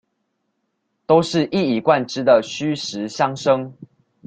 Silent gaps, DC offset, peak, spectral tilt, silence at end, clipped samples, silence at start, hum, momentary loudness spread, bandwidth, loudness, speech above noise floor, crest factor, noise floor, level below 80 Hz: none; under 0.1%; -2 dBFS; -5.5 dB/octave; 0.4 s; under 0.1%; 1.1 s; none; 9 LU; 9.2 kHz; -19 LUFS; 54 dB; 18 dB; -72 dBFS; -62 dBFS